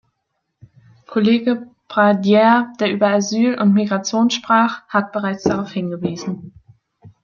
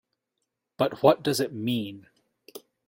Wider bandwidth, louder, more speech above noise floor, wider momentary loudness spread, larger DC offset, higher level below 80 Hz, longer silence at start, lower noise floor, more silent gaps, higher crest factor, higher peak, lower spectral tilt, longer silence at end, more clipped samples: second, 7.2 kHz vs 16.5 kHz; first, -17 LUFS vs -25 LUFS; about the same, 57 dB vs 57 dB; second, 11 LU vs 25 LU; neither; first, -60 dBFS vs -70 dBFS; first, 1.1 s vs 0.8 s; second, -74 dBFS vs -82 dBFS; neither; second, 16 dB vs 24 dB; first, -2 dBFS vs -6 dBFS; about the same, -5.5 dB/octave vs -5 dB/octave; second, 0.15 s vs 0.3 s; neither